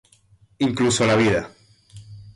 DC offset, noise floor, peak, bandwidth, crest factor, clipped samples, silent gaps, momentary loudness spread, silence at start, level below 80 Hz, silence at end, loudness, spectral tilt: under 0.1%; -56 dBFS; -8 dBFS; 11.5 kHz; 14 dB; under 0.1%; none; 8 LU; 0.6 s; -50 dBFS; 0.05 s; -20 LUFS; -4.5 dB/octave